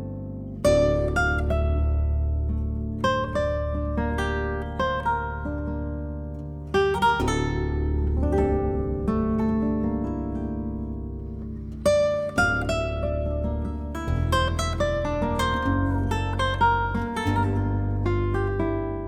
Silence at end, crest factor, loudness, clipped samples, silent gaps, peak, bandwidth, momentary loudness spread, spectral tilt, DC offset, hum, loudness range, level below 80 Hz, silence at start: 0 s; 16 dB; -25 LUFS; under 0.1%; none; -8 dBFS; 12.5 kHz; 9 LU; -6.5 dB/octave; under 0.1%; none; 2 LU; -30 dBFS; 0 s